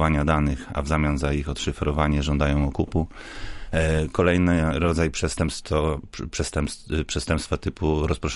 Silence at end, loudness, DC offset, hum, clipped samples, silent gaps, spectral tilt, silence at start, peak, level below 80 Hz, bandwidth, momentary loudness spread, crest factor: 0 s; -24 LUFS; under 0.1%; none; under 0.1%; none; -6 dB/octave; 0 s; -6 dBFS; -30 dBFS; 11.5 kHz; 8 LU; 16 dB